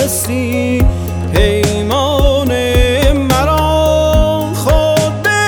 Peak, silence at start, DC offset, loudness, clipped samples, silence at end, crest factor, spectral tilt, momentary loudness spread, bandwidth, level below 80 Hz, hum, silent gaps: 0 dBFS; 0 s; under 0.1%; -13 LUFS; under 0.1%; 0 s; 12 dB; -5 dB/octave; 4 LU; over 20 kHz; -18 dBFS; none; none